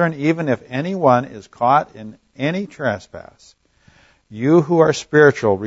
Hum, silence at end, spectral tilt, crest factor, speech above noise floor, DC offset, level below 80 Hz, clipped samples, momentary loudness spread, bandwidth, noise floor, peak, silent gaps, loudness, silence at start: none; 0 s; -6.5 dB/octave; 18 dB; 36 dB; under 0.1%; -58 dBFS; under 0.1%; 20 LU; 8 kHz; -53 dBFS; 0 dBFS; none; -17 LUFS; 0 s